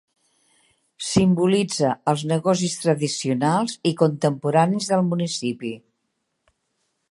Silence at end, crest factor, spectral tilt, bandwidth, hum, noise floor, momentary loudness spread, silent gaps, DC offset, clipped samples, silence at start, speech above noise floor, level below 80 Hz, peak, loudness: 1.35 s; 20 dB; -5.5 dB/octave; 11.5 kHz; none; -75 dBFS; 7 LU; none; under 0.1%; under 0.1%; 1 s; 54 dB; -58 dBFS; -2 dBFS; -21 LUFS